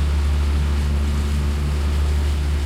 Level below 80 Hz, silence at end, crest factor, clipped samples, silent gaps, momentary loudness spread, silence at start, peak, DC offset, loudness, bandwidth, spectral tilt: -20 dBFS; 0 s; 8 dB; under 0.1%; none; 1 LU; 0 s; -12 dBFS; under 0.1%; -21 LUFS; 12.5 kHz; -6.5 dB/octave